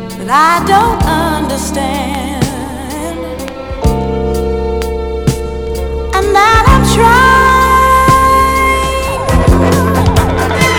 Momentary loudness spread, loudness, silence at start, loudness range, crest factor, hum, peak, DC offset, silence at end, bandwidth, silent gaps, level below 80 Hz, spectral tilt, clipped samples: 12 LU; -10 LUFS; 0 s; 9 LU; 10 dB; none; 0 dBFS; under 0.1%; 0 s; over 20 kHz; none; -20 dBFS; -5 dB/octave; 0.6%